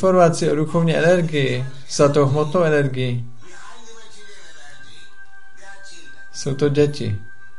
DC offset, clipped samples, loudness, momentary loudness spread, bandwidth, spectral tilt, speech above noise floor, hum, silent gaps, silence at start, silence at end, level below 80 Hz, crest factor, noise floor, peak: 4%; under 0.1%; -19 LUFS; 25 LU; 11.5 kHz; -6 dB/octave; 29 dB; none; none; 0 s; 0.35 s; -54 dBFS; 18 dB; -46 dBFS; -2 dBFS